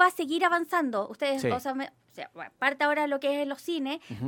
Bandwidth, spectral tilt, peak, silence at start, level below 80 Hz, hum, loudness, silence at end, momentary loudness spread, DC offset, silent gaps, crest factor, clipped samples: 17.5 kHz; -4.5 dB/octave; -8 dBFS; 0 s; -72 dBFS; none; -28 LUFS; 0 s; 15 LU; under 0.1%; none; 20 dB; under 0.1%